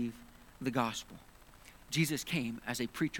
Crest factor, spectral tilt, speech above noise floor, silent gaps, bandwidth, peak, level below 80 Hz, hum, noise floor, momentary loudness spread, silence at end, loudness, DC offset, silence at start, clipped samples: 22 dB; -4.5 dB/octave; 22 dB; none; 19 kHz; -14 dBFS; -62 dBFS; none; -57 dBFS; 23 LU; 0 s; -36 LUFS; under 0.1%; 0 s; under 0.1%